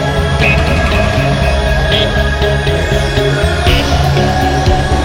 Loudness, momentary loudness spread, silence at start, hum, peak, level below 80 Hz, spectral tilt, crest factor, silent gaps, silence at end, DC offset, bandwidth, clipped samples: -12 LUFS; 2 LU; 0 s; none; 0 dBFS; -16 dBFS; -5.5 dB/octave; 10 dB; none; 0 s; under 0.1%; 16.5 kHz; under 0.1%